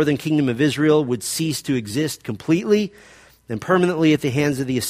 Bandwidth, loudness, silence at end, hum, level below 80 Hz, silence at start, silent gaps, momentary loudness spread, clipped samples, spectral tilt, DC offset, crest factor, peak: 15.5 kHz; -20 LUFS; 0 s; none; -56 dBFS; 0 s; none; 8 LU; under 0.1%; -5.5 dB/octave; under 0.1%; 16 dB; -4 dBFS